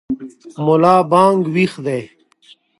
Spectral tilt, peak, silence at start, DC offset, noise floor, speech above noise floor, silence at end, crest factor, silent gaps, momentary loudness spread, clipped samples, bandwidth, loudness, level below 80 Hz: -7 dB/octave; 0 dBFS; 0.1 s; under 0.1%; -50 dBFS; 35 dB; 0.75 s; 16 dB; none; 15 LU; under 0.1%; 11.5 kHz; -15 LUFS; -58 dBFS